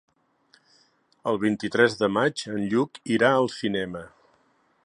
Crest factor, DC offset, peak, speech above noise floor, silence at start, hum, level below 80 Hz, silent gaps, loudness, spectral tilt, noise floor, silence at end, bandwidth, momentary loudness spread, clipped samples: 22 dB; under 0.1%; -4 dBFS; 41 dB; 1.25 s; none; -64 dBFS; none; -24 LUFS; -5.5 dB/octave; -65 dBFS; 0.75 s; 11 kHz; 9 LU; under 0.1%